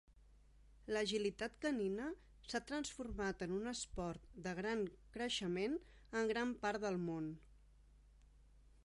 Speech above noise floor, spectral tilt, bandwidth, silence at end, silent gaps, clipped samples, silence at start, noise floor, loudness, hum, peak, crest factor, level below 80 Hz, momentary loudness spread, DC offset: 24 dB; -4.5 dB/octave; 11.5 kHz; 0.25 s; none; under 0.1%; 0.1 s; -66 dBFS; -43 LUFS; none; -26 dBFS; 18 dB; -62 dBFS; 8 LU; under 0.1%